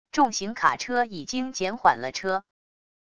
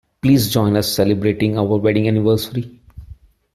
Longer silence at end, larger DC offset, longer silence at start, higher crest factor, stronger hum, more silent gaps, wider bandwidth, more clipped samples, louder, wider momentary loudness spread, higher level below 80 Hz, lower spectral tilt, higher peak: first, 0.75 s vs 0.4 s; first, 0.3% vs under 0.1%; second, 0.1 s vs 0.25 s; first, 22 dB vs 14 dB; neither; neither; second, 11 kHz vs 16 kHz; neither; second, -25 LUFS vs -17 LUFS; about the same, 7 LU vs 7 LU; second, -62 dBFS vs -44 dBFS; second, -3 dB/octave vs -6 dB/octave; about the same, -4 dBFS vs -2 dBFS